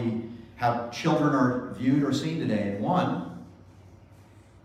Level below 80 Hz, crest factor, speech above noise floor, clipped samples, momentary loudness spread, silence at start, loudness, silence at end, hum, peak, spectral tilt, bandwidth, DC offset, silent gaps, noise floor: -60 dBFS; 16 dB; 27 dB; under 0.1%; 11 LU; 0 s; -27 LUFS; 0.25 s; none; -12 dBFS; -7 dB/octave; 14 kHz; under 0.1%; none; -52 dBFS